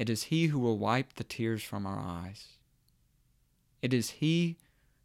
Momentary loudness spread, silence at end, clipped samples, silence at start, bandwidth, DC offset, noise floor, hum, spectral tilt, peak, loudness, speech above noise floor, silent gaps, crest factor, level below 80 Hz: 12 LU; 0.5 s; under 0.1%; 0 s; 16 kHz; under 0.1%; -70 dBFS; none; -5.5 dB/octave; -14 dBFS; -32 LUFS; 39 dB; none; 18 dB; -66 dBFS